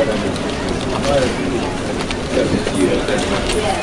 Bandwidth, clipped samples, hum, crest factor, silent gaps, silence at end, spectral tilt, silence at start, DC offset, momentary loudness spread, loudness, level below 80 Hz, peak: 11.5 kHz; under 0.1%; none; 14 dB; none; 0 s; -5 dB/octave; 0 s; under 0.1%; 5 LU; -18 LUFS; -30 dBFS; -4 dBFS